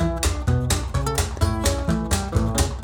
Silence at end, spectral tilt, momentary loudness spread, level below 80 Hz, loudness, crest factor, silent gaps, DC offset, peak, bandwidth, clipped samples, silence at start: 0 s; -5 dB/octave; 2 LU; -26 dBFS; -23 LUFS; 18 dB; none; under 0.1%; -4 dBFS; 19.5 kHz; under 0.1%; 0 s